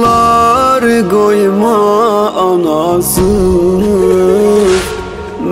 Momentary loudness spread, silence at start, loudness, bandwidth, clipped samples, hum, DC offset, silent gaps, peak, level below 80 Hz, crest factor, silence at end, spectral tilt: 3 LU; 0 s; -10 LUFS; 16.5 kHz; under 0.1%; none; under 0.1%; none; 0 dBFS; -28 dBFS; 10 dB; 0 s; -5.5 dB/octave